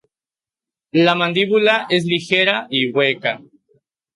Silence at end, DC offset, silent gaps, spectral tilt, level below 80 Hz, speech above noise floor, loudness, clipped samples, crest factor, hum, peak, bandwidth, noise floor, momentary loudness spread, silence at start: 0.8 s; under 0.1%; none; -5.5 dB/octave; -66 dBFS; over 73 dB; -16 LUFS; under 0.1%; 18 dB; none; -2 dBFS; 11.5 kHz; under -90 dBFS; 7 LU; 0.95 s